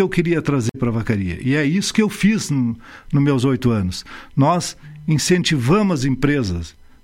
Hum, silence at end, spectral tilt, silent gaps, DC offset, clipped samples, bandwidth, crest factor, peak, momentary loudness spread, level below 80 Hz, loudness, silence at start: none; 0.35 s; -5.5 dB/octave; none; under 0.1%; under 0.1%; 16.5 kHz; 16 dB; -2 dBFS; 10 LU; -40 dBFS; -19 LUFS; 0 s